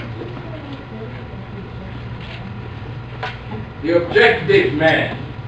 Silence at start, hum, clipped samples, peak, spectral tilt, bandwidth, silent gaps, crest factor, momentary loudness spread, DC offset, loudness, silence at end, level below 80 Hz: 0 s; none; under 0.1%; 0 dBFS; -7 dB/octave; 8.2 kHz; none; 20 dB; 18 LU; 0.2%; -17 LUFS; 0 s; -40 dBFS